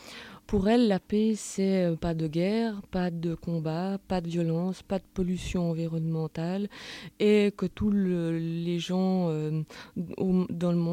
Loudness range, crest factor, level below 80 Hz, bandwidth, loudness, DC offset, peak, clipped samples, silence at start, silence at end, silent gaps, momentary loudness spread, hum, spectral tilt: 3 LU; 16 dB; -50 dBFS; 13.5 kHz; -29 LUFS; under 0.1%; -12 dBFS; under 0.1%; 0 s; 0 s; none; 9 LU; none; -7 dB/octave